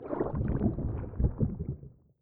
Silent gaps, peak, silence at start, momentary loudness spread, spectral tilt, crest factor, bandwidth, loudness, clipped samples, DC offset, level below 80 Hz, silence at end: none; -14 dBFS; 0 s; 9 LU; -14 dB/octave; 18 dB; 2.8 kHz; -33 LUFS; under 0.1%; under 0.1%; -38 dBFS; 0.3 s